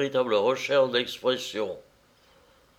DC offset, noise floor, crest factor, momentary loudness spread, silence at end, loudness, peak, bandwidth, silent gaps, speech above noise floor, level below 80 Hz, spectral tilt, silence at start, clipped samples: under 0.1%; -60 dBFS; 16 dB; 10 LU; 1 s; -26 LUFS; -10 dBFS; 15 kHz; none; 34 dB; -70 dBFS; -4 dB/octave; 0 s; under 0.1%